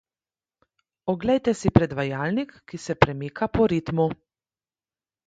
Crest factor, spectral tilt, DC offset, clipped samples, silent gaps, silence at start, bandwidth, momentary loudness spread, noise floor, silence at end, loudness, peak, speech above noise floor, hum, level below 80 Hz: 24 dB; -7 dB/octave; under 0.1%; under 0.1%; none; 1.05 s; 9.2 kHz; 13 LU; under -90 dBFS; 1.15 s; -24 LUFS; 0 dBFS; over 67 dB; none; -44 dBFS